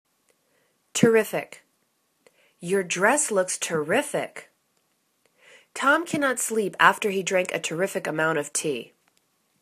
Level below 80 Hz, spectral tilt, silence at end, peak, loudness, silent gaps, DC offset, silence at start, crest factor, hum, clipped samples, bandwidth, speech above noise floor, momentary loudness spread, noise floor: -74 dBFS; -3 dB/octave; 0.75 s; -2 dBFS; -24 LUFS; none; under 0.1%; 0.95 s; 24 dB; none; under 0.1%; 14 kHz; 47 dB; 12 LU; -71 dBFS